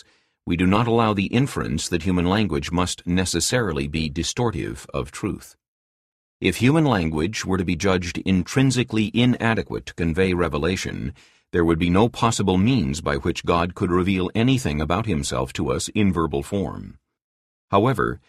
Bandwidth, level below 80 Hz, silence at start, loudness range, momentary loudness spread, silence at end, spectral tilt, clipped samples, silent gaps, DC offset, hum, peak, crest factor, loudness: 14 kHz; -40 dBFS; 0.45 s; 3 LU; 8 LU; 0.1 s; -5.5 dB/octave; under 0.1%; 5.68-6.40 s, 17.24-17.68 s; under 0.1%; none; -4 dBFS; 18 dB; -22 LUFS